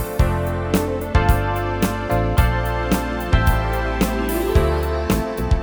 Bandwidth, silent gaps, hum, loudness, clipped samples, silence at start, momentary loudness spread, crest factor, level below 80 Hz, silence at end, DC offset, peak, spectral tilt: over 20 kHz; none; none; -20 LUFS; under 0.1%; 0 s; 4 LU; 16 dB; -22 dBFS; 0 s; under 0.1%; -2 dBFS; -6.5 dB/octave